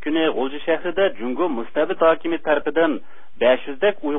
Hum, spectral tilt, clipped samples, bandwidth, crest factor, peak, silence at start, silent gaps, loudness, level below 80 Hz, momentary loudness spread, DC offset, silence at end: none; -9.5 dB/octave; under 0.1%; 3.8 kHz; 16 dB; -4 dBFS; 0 s; none; -21 LUFS; -58 dBFS; 5 LU; 4%; 0 s